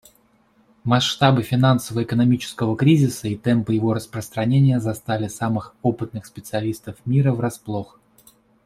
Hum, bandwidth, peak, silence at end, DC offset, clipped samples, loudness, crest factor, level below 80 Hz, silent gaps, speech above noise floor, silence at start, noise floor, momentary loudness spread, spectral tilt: none; 14.5 kHz; -2 dBFS; 0.8 s; under 0.1%; under 0.1%; -21 LUFS; 18 dB; -56 dBFS; none; 39 dB; 0.85 s; -59 dBFS; 13 LU; -6.5 dB/octave